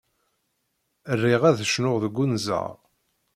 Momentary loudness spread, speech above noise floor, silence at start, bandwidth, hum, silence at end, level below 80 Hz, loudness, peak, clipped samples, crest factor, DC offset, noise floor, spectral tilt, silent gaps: 10 LU; 52 dB; 1.05 s; 15 kHz; none; 0.6 s; -64 dBFS; -23 LUFS; -6 dBFS; under 0.1%; 20 dB; under 0.1%; -75 dBFS; -5.5 dB/octave; none